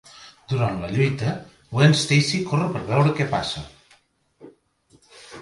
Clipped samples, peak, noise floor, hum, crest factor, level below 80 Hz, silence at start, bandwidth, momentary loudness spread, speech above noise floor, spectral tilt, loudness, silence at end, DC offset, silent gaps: under 0.1%; -2 dBFS; -60 dBFS; none; 20 dB; -52 dBFS; 0.2 s; 11.5 kHz; 17 LU; 39 dB; -5.5 dB/octave; -21 LUFS; 0 s; under 0.1%; none